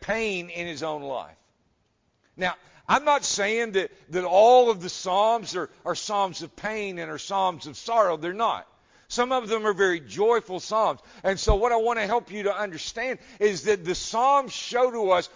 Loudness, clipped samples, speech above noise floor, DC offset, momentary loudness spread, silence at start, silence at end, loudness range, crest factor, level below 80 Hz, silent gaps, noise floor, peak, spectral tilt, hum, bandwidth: -25 LUFS; under 0.1%; 46 dB; under 0.1%; 10 LU; 0 s; 0.1 s; 5 LU; 20 dB; -44 dBFS; none; -70 dBFS; -6 dBFS; -3.5 dB/octave; none; 7.6 kHz